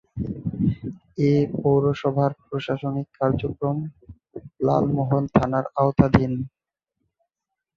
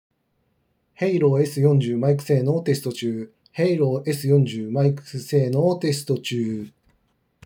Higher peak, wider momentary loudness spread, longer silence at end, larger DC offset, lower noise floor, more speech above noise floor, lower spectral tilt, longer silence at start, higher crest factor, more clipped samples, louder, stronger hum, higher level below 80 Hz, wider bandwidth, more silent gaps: first, 0 dBFS vs -6 dBFS; first, 13 LU vs 9 LU; first, 1.3 s vs 0.75 s; neither; first, -85 dBFS vs -69 dBFS; first, 63 dB vs 48 dB; first, -9.5 dB/octave vs -7 dB/octave; second, 0.15 s vs 1 s; first, 22 dB vs 16 dB; neither; about the same, -23 LUFS vs -22 LUFS; neither; first, -44 dBFS vs -72 dBFS; second, 6.8 kHz vs 19.5 kHz; neither